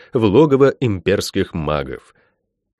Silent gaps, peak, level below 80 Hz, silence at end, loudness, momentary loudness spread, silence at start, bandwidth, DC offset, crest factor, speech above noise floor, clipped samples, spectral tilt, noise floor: none; -2 dBFS; -42 dBFS; 0.8 s; -16 LUFS; 11 LU; 0.15 s; 13 kHz; under 0.1%; 16 dB; 50 dB; under 0.1%; -6.5 dB/octave; -66 dBFS